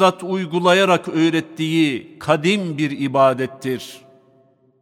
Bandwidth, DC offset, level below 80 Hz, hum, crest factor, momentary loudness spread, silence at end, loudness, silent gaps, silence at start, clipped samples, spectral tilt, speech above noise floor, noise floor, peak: 15 kHz; under 0.1%; -66 dBFS; none; 16 dB; 11 LU; 0.85 s; -19 LUFS; none; 0 s; under 0.1%; -5.5 dB/octave; 38 dB; -56 dBFS; -2 dBFS